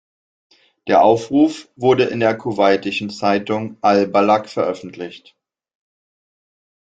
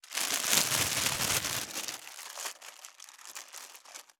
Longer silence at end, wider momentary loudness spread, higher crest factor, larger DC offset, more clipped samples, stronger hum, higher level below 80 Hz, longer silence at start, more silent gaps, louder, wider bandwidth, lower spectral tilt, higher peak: first, 1.7 s vs 0.2 s; second, 12 LU vs 22 LU; second, 16 dB vs 30 dB; neither; neither; neither; about the same, -60 dBFS vs -64 dBFS; first, 0.85 s vs 0.05 s; neither; first, -17 LUFS vs -29 LUFS; second, 9 kHz vs over 20 kHz; first, -6 dB/octave vs -0.5 dB/octave; about the same, -2 dBFS vs -4 dBFS